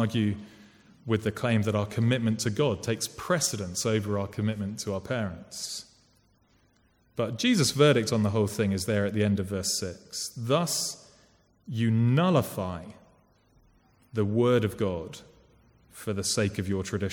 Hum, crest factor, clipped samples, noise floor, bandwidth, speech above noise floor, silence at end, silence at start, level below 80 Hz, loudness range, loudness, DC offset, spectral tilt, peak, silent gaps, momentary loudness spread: none; 20 dB; under 0.1%; -65 dBFS; 18.5 kHz; 38 dB; 0 s; 0 s; -60 dBFS; 5 LU; -28 LUFS; under 0.1%; -5 dB/octave; -8 dBFS; none; 12 LU